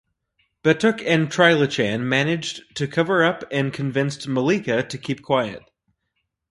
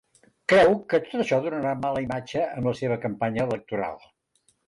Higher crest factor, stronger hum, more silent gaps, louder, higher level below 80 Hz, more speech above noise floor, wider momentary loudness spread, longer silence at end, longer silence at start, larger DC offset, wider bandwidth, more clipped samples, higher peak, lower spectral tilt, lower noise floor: about the same, 20 dB vs 16 dB; neither; neither; first, -21 LUFS vs -25 LUFS; about the same, -60 dBFS vs -58 dBFS; first, 55 dB vs 44 dB; about the same, 11 LU vs 12 LU; first, 0.9 s vs 0.7 s; first, 0.65 s vs 0.5 s; neither; about the same, 11.5 kHz vs 11.5 kHz; neither; first, -2 dBFS vs -10 dBFS; about the same, -5.5 dB/octave vs -6.5 dB/octave; first, -76 dBFS vs -68 dBFS